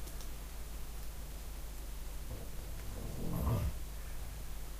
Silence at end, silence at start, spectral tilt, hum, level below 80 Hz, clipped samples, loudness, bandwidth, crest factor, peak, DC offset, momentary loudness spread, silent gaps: 0 s; 0 s; -5.5 dB/octave; none; -42 dBFS; under 0.1%; -44 LUFS; 15.5 kHz; 16 dB; -24 dBFS; under 0.1%; 11 LU; none